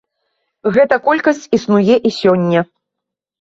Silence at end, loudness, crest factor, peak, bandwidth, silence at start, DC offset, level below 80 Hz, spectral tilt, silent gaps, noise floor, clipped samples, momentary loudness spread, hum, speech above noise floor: 0.75 s; -14 LUFS; 14 dB; 0 dBFS; 7.8 kHz; 0.65 s; under 0.1%; -56 dBFS; -6.5 dB/octave; none; -81 dBFS; under 0.1%; 5 LU; none; 68 dB